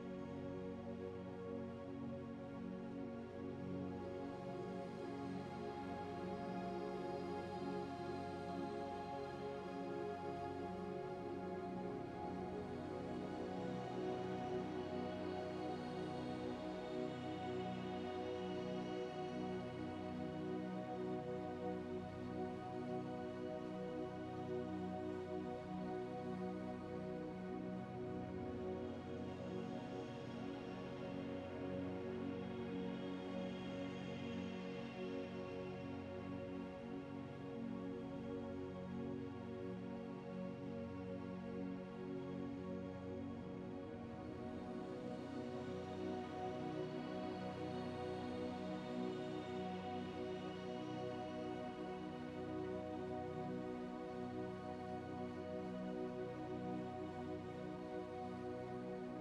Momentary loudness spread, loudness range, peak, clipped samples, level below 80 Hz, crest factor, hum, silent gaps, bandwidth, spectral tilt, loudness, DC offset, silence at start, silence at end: 3 LU; 3 LU; -32 dBFS; under 0.1%; -72 dBFS; 16 dB; 60 Hz at -80 dBFS; none; 11.5 kHz; -7.5 dB/octave; -47 LUFS; under 0.1%; 0 s; 0 s